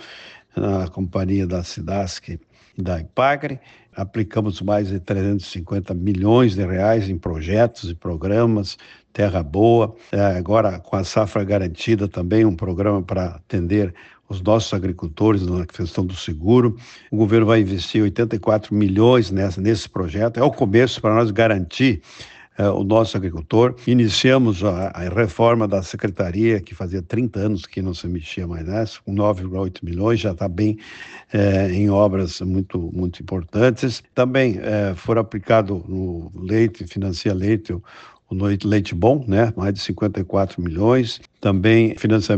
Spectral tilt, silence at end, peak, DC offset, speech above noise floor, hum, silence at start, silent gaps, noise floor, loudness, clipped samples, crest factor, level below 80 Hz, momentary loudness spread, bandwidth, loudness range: -7 dB/octave; 0 s; -2 dBFS; under 0.1%; 23 dB; none; 0 s; none; -42 dBFS; -20 LUFS; under 0.1%; 16 dB; -46 dBFS; 11 LU; 8.4 kHz; 5 LU